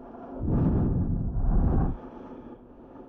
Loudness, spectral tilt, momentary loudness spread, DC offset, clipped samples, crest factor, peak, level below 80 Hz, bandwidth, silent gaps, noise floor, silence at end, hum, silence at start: -28 LUFS; -13 dB/octave; 20 LU; under 0.1%; under 0.1%; 14 dB; -14 dBFS; -30 dBFS; 2.6 kHz; none; -47 dBFS; 0 s; none; 0 s